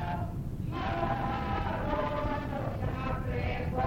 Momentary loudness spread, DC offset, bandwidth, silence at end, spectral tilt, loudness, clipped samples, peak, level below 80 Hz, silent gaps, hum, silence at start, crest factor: 4 LU; under 0.1%; 16.5 kHz; 0 s; -8 dB/octave; -33 LUFS; under 0.1%; -18 dBFS; -40 dBFS; none; none; 0 s; 14 dB